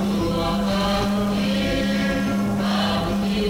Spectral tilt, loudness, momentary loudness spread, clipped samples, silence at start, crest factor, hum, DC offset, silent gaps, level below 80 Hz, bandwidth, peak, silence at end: -5.5 dB/octave; -22 LUFS; 1 LU; under 0.1%; 0 s; 10 dB; none; under 0.1%; none; -36 dBFS; 19.5 kHz; -12 dBFS; 0 s